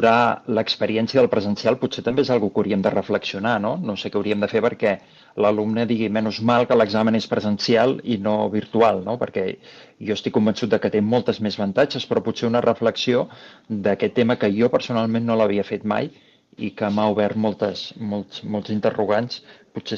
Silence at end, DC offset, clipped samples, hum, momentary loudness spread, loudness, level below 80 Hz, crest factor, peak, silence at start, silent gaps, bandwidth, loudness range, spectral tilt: 0 s; under 0.1%; under 0.1%; none; 10 LU; -21 LUFS; -62 dBFS; 16 dB; -4 dBFS; 0 s; none; 7.4 kHz; 3 LU; -6.5 dB/octave